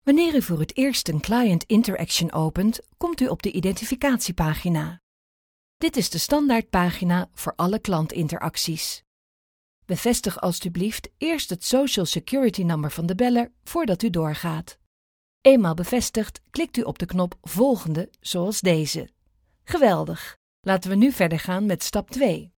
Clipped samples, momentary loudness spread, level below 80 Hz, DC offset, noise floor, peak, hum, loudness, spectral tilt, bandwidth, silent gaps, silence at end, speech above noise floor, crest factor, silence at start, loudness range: under 0.1%; 9 LU; -46 dBFS; under 0.1%; -66 dBFS; -2 dBFS; none; -23 LUFS; -5 dB/octave; over 20 kHz; 5.03-5.80 s, 9.07-9.82 s, 14.86-15.41 s, 20.36-20.63 s; 0.1 s; 43 dB; 20 dB; 0.05 s; 4 LU